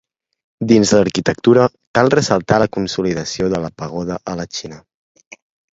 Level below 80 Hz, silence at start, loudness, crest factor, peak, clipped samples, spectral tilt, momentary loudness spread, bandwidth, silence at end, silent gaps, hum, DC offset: -46 dBFS; 0.6 s; -16 LUFS; 18 dB; 0 dBFS; under 0.1%; -5 dB/octave; 12 LU; 8 kHz; 1 s; 1.87-1.94 s; none; under 0.1%